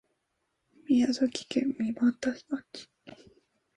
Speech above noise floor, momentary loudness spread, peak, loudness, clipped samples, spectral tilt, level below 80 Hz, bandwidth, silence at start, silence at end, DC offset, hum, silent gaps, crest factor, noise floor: 51 dB; 18 LU; -14 dBFS; -29 LUFS; under 0.1%; -4.5 dB/octave; -70 dBFS; 10.5 kHz; 0.9 s; 0.6 s; under 0.1%; none; none; 18 dB; -79 dBFS